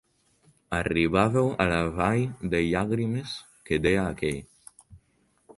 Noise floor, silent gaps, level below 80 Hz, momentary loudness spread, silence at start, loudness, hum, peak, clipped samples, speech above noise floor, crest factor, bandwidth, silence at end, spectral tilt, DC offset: -68 dBFS; none; -46 dBFS; 10 LU; 0.7 s; -26 LUFS; none; -6 dBFS; under 0.1%; 42 dB; 20 dB; 11.5 kHz; 0.05 s; -6.5 dB/octave; under 0.1%